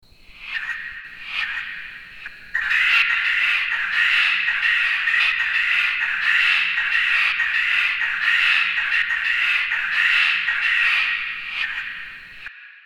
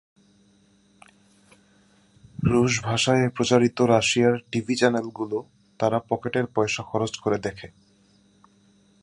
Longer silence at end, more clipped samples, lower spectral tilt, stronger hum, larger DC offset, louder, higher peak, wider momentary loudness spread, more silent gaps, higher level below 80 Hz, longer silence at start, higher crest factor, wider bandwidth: second, 0.05 s vs 1.35 s; neither; second, 1.5 dB/octave vs -5 dB/octave; neither; neither; first, -18 LUFS vs -23 LUFS; about the same, -4 dBFS vs -4 dBFS; first, 17 LU vs 10 LU; neither; about the same, -54 dBFS vs -54 dBFS; second, 0.35 s vs 2.4 s; second, 16 dB vs 22 dB; first, 16 kHz vs 11.5 kHz